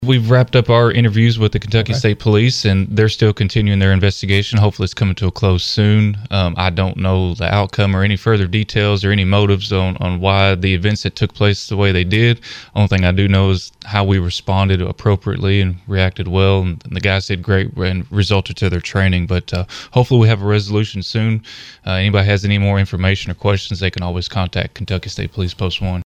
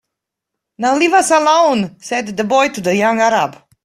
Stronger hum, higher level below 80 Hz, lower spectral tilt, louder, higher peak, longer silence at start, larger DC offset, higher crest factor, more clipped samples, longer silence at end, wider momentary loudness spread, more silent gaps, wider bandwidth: neither; first, -36 dBFS vs -58 dBFS; first, -6.5 dB/octave vs -3.5 dB/octave; about the same, -16 LUFS vs -14 LUFS; about the same, 0 dBFS vs 0 dBFS; second, 0 s vs 0.8 s; neither; about the same, 14 dB vs 14 dB; neither; second, 0.05 s vs 0.3 s; about the same, 7 LU vs 9 LU; neither; second, 8.2 kHz vs 15 kHz